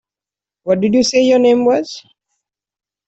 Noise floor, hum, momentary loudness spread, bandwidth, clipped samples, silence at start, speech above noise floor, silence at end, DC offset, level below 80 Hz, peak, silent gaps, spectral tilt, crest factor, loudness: -89 dBFS; none; 17 LU; 8.2 kHz; under 0.1%; 0.65 s; 76 dB; 1.1 s; under 0.1%; -56 dBFS; -2 dBFS; none; -4.5 dB/octave; 14 dB; -13 LUFS